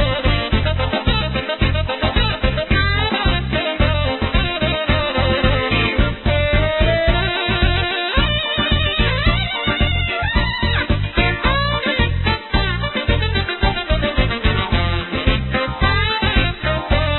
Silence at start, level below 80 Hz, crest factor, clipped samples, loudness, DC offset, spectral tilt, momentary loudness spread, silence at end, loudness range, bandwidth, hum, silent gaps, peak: 0 s; -22 dBFS; 16 dB; under 0.1%; -18 LUFS; under 0.1%; -11 dB/octave; 3 LU; 0 s; 1 LU; 4.3 kHz; none; none; -2 dBFS